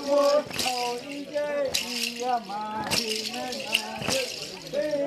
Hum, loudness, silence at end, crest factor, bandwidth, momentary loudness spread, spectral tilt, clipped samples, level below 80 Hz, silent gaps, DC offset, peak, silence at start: none; -27 LUFS; 0 s; 22 dB; 14.5 kHz; 8 LU; -2 dB/octave; under 0.1%; -62 dBFS; none; under 0.1%; -6 dBFS; 0 s